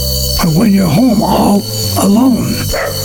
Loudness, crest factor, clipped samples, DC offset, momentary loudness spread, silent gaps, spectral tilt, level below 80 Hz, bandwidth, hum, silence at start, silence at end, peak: -11 LUFS; 10 dB; under 0.1%; under 0.1%; 5 LU; none; -5 dB/octave; -26 dBFS; 19 kHz; none; 0 s; 0 s; 0 dBFS